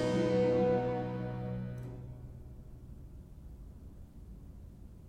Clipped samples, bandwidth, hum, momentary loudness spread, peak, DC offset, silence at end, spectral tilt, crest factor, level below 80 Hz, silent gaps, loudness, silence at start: under 0.1%; 9.6 kHz; none; 23 LU; -20 dBFS; under 0.1%; 0 s; -8 dB/octave; 16 dB; -52 dBFS; none; -33 LUFS; 0 s